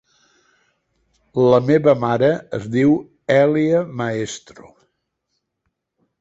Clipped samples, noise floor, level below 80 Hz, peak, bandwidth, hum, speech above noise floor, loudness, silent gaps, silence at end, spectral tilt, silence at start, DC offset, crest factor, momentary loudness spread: under 0.1%; -75 dBFS; -56 dBFS; -2 dBFS; 8 kHz; none; 58 dB; -18 LUFS; none; 1.85 s; -7 dB/octave; 1.35 s; under 0.1%; 18 dB; 11 LU